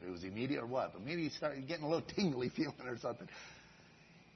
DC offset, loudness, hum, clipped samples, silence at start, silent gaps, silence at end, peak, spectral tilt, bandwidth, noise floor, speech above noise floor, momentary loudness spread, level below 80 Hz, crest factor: under 0.1%; -40 LUFS; none; under 0.1%; 0 s; none; 0.05 s; -22 dBFS; -5 dB/octave; 6.2 kHz; -62 dBFS; 23 dB; 15 LU; -72 dBFS; 18 dB